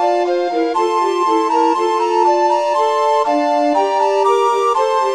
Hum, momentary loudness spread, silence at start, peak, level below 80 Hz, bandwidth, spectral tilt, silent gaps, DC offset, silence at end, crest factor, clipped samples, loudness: none; 2 LU; 0 s; -4 dBFS; -64 dBFS; 12.5 kHz; -2 dB/octave; none; 0.2%; 0 s; 12 dB; under 0.1%; -15 LUFS